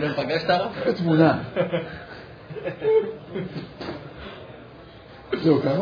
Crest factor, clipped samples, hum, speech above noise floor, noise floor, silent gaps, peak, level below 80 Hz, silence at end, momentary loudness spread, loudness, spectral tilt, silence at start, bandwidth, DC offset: 20 dB; under 0.1%; none; 21 dB; -44 dBFS; none; -4 dBFS; -54 dBFS; 0 s; 22 LU; -24 LUFS; -8.5 dB/octave; 0 s; 5.2 kHz; under 0.1%